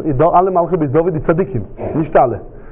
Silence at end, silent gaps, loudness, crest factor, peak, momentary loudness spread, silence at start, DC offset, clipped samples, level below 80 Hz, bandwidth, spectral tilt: 0 s; none; -15 LUFS; 14 dB; 0 dBFS; 10 LU; 0 s; under 0.1%; under 0.1%; -36 dBFS; 3.7 kHz; -12.5 dB/octave